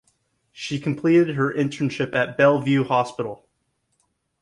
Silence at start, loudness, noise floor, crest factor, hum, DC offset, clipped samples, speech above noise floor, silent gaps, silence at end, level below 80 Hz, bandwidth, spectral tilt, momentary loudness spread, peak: 0.55 s; -21 LUFS; -72 dBFS; 18 dB; none; under 0.1%; under 0.1%; 51 dB; none; 1.05 s; -64 dBFS; 11 kHz; -6.5 dB/octave; 13 LU; -4 dBFS